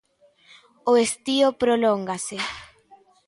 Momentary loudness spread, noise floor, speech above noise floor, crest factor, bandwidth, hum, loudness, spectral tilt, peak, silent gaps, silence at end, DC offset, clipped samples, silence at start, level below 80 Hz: 10 LU; -57 dBFS; 36 dB; 16 dB; 11.5 kHz; none; -22 LUFS; -3.5 dB/octave; -8 dBFS; none; 0.6 s; under 0.1%; under 0.1%; 0.85 s; -62 dBFS